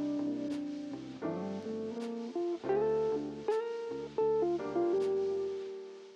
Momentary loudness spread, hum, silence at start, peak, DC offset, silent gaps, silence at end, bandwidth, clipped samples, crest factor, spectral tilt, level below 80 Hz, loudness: 9 LU; none; 0 s; -22 dBFS; under 0.1%; none; 0 s; 9.4 kHz; under 0.1%; 14 dB; -7 dB/octave; -70 dBFS; -35 LUFS